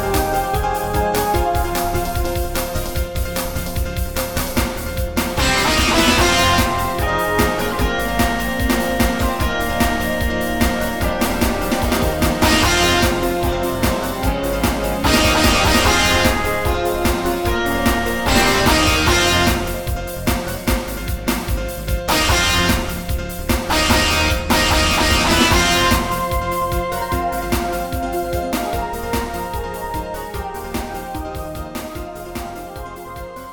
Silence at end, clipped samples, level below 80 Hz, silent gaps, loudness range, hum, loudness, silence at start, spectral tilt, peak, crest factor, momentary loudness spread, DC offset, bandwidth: 0 s; under 0.1%; -26 dBFS; none; 7 LU; none; -18 LUFS; 0 s; -4 dB/octave; -2 dBFS; 16 dB; 12 LU; under 0.1%; 19.5 kHz